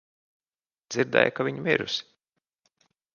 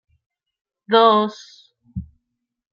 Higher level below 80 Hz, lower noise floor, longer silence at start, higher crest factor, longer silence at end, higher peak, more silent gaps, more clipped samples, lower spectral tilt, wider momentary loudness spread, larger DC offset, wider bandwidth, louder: second, -70 dBFS vs -52 dBFS; first, under -90 dBFS vs -79 dBFS; about the same, 0.9 s vs 0.9 s; first, 28 dB vs 20 dB; first, 1.15 s vs 0.7 s; about the same, -2 dBFS vs -2 dBFS; neither; neither; about the same, -4.5 dB/octave vs -5.5 dB/octave; second, 9 LU vs 21 LU; neither; about the same, 7.2 kHz vs 7.2 kHz; second, -26 LUFS vs -16 LUFS